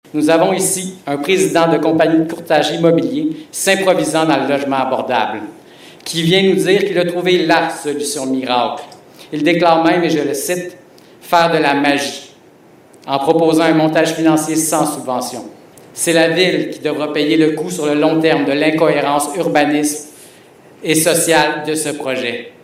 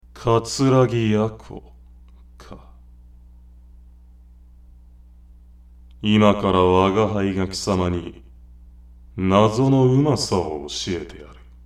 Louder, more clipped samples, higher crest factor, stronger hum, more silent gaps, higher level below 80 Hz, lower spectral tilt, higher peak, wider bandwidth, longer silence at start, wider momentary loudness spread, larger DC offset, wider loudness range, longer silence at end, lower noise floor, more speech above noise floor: first, -14 LUFS vs -19 LUFS; neither; about the same, 16 dB vs 20 dB; neither; neither; second, -60 dBFS vs -44 dBFS; second, -4 dB/octave vs -6 dB/octave; about the same, 0 dBFS vs -2 dBFS; first, 16.5 kHz vs 13 kHz; about the same, 0.15 s vs 0.15 s; second, 9 LU vs 19 LU; neither; second, 2 LU vs 5 LU; second, 0.15 s vs 0.3 s; about the same, -45 dBFS vs -47 dBFS; about the same, 30 dB vs 28 dB